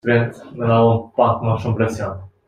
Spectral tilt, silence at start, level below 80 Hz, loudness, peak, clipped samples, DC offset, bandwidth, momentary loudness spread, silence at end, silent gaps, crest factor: -8 dB/octave; 0.05 s; -50 dBFS; -19 LUFS; -2 dBFS; under 0.1%; under 0.1%; 9.4 kHz; 11 LU; 0.2 s; none; 16 dB